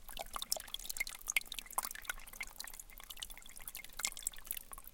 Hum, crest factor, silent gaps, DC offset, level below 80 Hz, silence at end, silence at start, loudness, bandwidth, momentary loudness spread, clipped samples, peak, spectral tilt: none; 30 dB; none; under 0.1%; -56 dBFS; 0 s; 0 s; -42 LUFS; 17 kHz; 11 LU; under 0.1%; -14 dBFS; 1 dB/octave